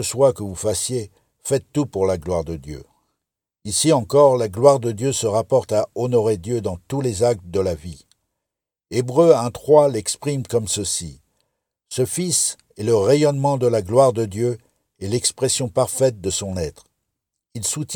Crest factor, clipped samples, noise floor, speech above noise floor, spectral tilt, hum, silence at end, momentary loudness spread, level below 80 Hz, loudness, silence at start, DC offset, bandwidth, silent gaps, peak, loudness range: 20 dB; under 0.1%; -85 dBFS; 65 dB; -5 dB/octave; none; 0 s; 13 LU; -50 dBFS; -19 LUFS; 0 s; under 0.1%; 19 kHz; none; 0 dBFS; 5 LU